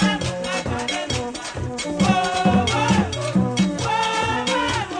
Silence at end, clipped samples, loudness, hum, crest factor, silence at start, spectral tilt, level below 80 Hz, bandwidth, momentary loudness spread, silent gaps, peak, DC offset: 0 s; under 0.1%; -21 LUFS; none; 18 dB; 0 s; -4.5 dB/octave; -42 dBFS; 10 kHz; 7 LU; none; -4 dBFS; under 0.1%